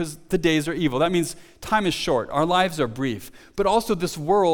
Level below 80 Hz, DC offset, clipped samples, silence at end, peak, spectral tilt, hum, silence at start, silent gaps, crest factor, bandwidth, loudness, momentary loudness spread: -46 dBFS; under 0.1%; under 0.1%; 0 s; -6 dBFS; -5 dB/octave; none; 0 s; none; 16 dB; 19 kHz; -23 LUFS; 8 LU